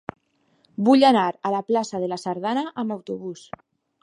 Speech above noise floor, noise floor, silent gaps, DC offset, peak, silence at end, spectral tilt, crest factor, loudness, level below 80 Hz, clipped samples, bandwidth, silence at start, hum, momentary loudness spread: 43 dB; -65 dBFS; none; under 0.1%; -4 dBFS; 0.65 s; -5.5 dB/octave; 20 dB; -22 LUFS; -68 dBFS; under 0.1%; 11.5 kHz; 0.8 s; none; 23 LU